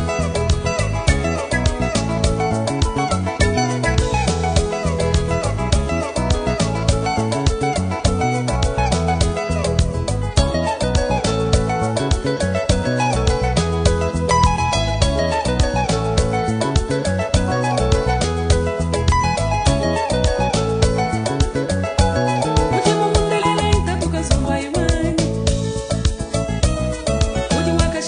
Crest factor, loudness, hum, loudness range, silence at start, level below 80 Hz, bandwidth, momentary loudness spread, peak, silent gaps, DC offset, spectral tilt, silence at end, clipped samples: 16 dB; -19 LUFS; none; 2 LU; 0 s; -24 dBFS; 10 kHz; 3 LU; -2 dBFS; none; under 0.1%; -5 dB/octave; 0 s; under 0.1%